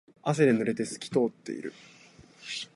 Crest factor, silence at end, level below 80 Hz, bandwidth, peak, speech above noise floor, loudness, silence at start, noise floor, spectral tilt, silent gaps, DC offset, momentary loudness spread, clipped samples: 20 dB; 0.1 s; -70 dBFS; 11.5 kHz; -10 dBFS; 25 dB; -29 LUFS; 0.25 s; -54 dBFS; -5.5 dB/octave; none; under 0.1%; 15 LU; under 0.1%